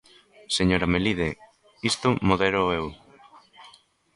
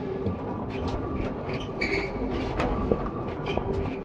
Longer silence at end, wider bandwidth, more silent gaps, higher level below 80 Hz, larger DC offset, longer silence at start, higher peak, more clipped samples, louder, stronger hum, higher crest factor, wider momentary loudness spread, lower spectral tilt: first, 0.45 s vs 0 s; first, 11.5 kHz vs 9.8 kHz; neither; second, -44 dBFS vs -38 dBFS; neither; first, 0.5 s vs 0 s; about the same, -6 dBFS vs -6 dBFS; neither; first, -24 LUFS vs -30 LUFS; neither; about the same, 22 dB vs 22 dB; first, 9 LU vs 5 LU; second, -5 dB/octave vs -7.5 dB/octave